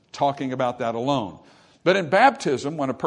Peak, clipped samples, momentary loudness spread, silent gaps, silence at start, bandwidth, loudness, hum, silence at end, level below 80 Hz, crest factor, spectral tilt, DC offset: -2 dBFS; under 0.1%; 9 LU; none; 0.15 s; 10.5 kHz; -22 LUFS; none; 0 s; -68 dBFS; 20 dB; -5.5 dB/octave; under 0.1%